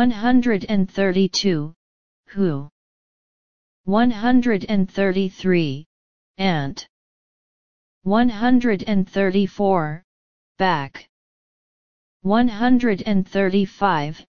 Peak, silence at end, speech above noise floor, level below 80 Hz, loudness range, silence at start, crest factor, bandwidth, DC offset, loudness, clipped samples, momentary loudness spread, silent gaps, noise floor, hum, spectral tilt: -4 dBFS; 0.05 s; over 71 dB; -48 dBFS; 3 LU; 0 s; 18 dB; 7 kHz; 2%; -20 LUFS; under 0.1%; 12 LU; 1.76-2.24 s, 2.72-3.84 s, 5.86-6.34 s, 6.89-8.01 s, 10.04-10.55 s, 11.09-12.20 s; under -90 dBFS; none; -6.5 dB/octave